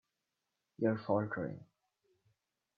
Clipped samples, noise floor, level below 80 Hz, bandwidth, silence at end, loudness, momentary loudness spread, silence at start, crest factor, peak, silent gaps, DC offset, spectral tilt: under 0.1%; -87 dBFS; -78 dBFS; 5 kHz; 1.15 s; -36 LUFS; 10 LU; 0.8 s; 22 dB; -18 dBFS; none; under 0.1%; -7.5 dB/octave